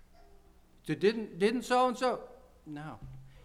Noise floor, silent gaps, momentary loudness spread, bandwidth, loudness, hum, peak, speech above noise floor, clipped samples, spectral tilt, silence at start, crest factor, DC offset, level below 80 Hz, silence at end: -60 dBFS; none; 20 LU; 14.5 kHz; -31 LUFS; none; -14 dBFS; 29 dB; under 0.1%; -5 dB/octave; 0.85 s; 18 dB; under 0.1%; -60 dBFS; 0.15 s